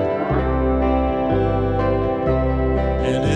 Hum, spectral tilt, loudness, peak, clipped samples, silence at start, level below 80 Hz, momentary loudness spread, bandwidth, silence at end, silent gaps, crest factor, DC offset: none; -8 dB/octave; -20 LUFS; -6 dBFS; under 0.1%; 0 s; -26 dBFS; 1 LU; 9 kHz; 0 s; none; 12 dB; under 0.1%